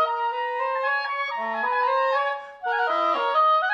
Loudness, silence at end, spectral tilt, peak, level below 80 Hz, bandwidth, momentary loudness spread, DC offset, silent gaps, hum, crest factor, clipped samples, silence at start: -24 LUFS; 0 s; -2.5 dB/octave; -12 dBFS; -76 dBFS; 7.4 kHz; 7 LU; under 0.1%; none; none; 12 dB; under 0.1%; 0 s